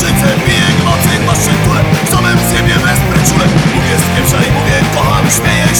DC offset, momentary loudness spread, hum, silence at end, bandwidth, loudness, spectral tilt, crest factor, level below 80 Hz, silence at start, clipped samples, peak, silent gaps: under 0.1%; 1 LU; none; 0 s; over 20 kHz; -10 LUFS; -4.5 dB/octave; 10 dB; -24 dBFS; 0 s; under 0.1%; 0 dBFS; none